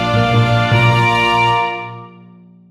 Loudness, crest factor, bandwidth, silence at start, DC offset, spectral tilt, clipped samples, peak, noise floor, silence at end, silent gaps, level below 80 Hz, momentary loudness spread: -13 LUFS; 14 dB; 11 kHz; 0 s; under 0.1%; -6 dB/octave; under 0.1%; -2 dBFS; -42 dBFS; 0.6 s; none; -38 dBFS; 10 LU